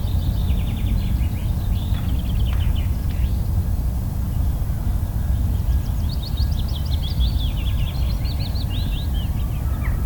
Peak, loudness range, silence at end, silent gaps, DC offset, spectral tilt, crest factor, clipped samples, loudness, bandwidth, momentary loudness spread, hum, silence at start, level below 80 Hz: -8 dBFS; 1 LU; 0 s; none; under 0.1%; -6.5 dB/octave; 12 dB; under 0.1%; -23 LUFS; 19.5 kHz; 2 LU; none; 0 s; -22 dBFS